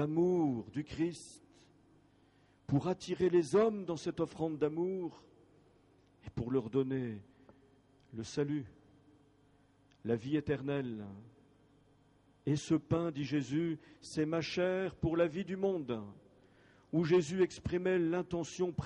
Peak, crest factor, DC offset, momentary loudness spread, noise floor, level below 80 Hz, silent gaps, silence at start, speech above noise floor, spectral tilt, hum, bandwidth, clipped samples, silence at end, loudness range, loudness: -18 dBFS; 18 dB; under 0.1%; 15 LU; -67 dBFS; -62 dBFS; none; 0 s; 33 dB; -7 dB/octave; none; 11 kHz; under 0.1%; 0 s; 6 LU; -35 LUFS